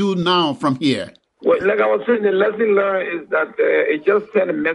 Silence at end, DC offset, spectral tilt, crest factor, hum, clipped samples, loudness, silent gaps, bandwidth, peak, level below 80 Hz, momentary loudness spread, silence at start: 0 s; under 0.1%; -6 dB/octave; 16 dB; none; under 0.1%; -18 LUFS; none; 11 kHz; -2 dBFS; -62 dBFS; 5 LU; 0 s